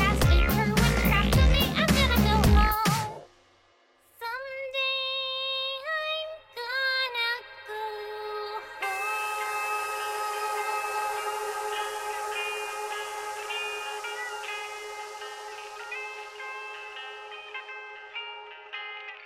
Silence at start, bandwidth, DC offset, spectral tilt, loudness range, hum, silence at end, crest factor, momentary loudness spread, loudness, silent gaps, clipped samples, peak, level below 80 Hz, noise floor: 0 s; 16.5 kHz; under 0.1%; -4.5 dB/octave; 14 LU; none; 0 s; 18 dB; 16 LU; -28 LUFS; none; under 0.1%; -10 dBFS; -34 dBFS; -63 dBFS